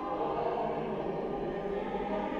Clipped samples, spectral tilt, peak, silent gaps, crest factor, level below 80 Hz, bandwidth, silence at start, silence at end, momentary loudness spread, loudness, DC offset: under 0.1%; -8 dB/octave; -20 dBFS; none; 14 dB; -54 dBFS; 7.4 kHz; 0 s; 0 s; 3 LU; -34 LUFS; under 0.1%